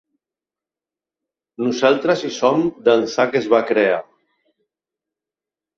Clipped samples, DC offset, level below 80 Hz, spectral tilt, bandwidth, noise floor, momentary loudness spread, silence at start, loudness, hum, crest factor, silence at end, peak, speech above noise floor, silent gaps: under 0.1%; under 0.1%; -66 dBFS; -5 dB/octave; 7.6 kHz; -89 dBFS; 5 LU; 1.6 s; -18 LUFS; none; 20 dB; 1.75 s; -2 dBFS; 72 dB; none